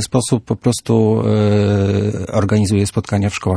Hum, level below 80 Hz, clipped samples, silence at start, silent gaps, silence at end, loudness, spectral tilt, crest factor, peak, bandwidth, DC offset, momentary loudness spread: none; -44 dBFS; under 0.1%; 0 s; none; 0 s; -16 LUFS; -6.5 dB/octave; 14 dB; -2 dBFS; 11 kHz; under 0.1%; 4 LU